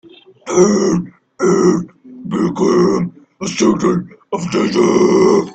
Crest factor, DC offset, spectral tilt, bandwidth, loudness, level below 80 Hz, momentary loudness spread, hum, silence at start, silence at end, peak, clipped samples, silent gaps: 14 dB; under 0.1%; -6 dB/octave; 8.6 kHz; -15 LUFS; -50 dBFS; 14 LU; none; 0.45 s; 0 s; 0 dBFS; under 0.1%; none